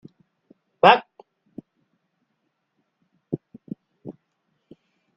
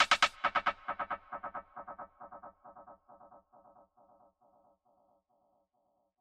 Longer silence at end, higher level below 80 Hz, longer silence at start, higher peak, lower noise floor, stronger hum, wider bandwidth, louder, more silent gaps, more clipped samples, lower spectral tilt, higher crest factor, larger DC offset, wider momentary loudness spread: second, 1.05 s vs 3.25 s; about the same, -70 dBFS vs -70 dBFS; first, 0.85 s vs 0 s; first, 0 dBFS vs -10 dBFS; about the same, -75 dBFS vs -78 dBFS; neither; second, 7.8 kHz vs 13 kHz; first, -20 LUFS vs -34 LUFS; neither; neither; first, -6 dB/octave vs -0.5 dB/octave; about the same, 28 dB vs 28 dB; neither; about the same, 27 LU vs 27 LU